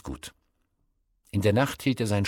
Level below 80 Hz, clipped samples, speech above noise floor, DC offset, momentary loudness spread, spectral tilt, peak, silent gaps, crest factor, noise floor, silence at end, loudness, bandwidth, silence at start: -52 dBFS; under 0.1%; 47 dB; under 0.1%; 17 LU; -6 dB/octave; -10 dBFS; none; 18 dB; -72 dBFS; 0 s; -26 LUFS; 18 kHz; 0.05 s